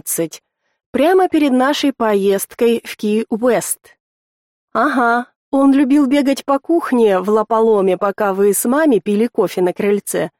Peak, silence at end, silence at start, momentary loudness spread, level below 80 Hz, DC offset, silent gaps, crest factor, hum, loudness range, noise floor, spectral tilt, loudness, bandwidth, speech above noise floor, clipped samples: -4 dBFS; 0.1 s; 0.05 s; 7 LU; -60 dBFS; under 0.1%; 0.86-0.93 s, 4.00-4.68 s, 5.36-5.52 s; 12 dB; none; 3 LU; under -90 dBFS; -4.5 dB/octave; -15 LUFS; 17 kHz; over 75 dB; under 0.1%